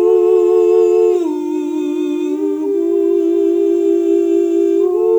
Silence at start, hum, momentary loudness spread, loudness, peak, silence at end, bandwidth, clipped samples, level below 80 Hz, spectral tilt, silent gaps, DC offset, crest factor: 0 s; none; 7 LU; -14 LUFS; -2 dBFS; 0 s; 8.2 kHz; under 0.1%; -68 dBFS; -5.5 dB/octave; none; under 0.1%; 10 dB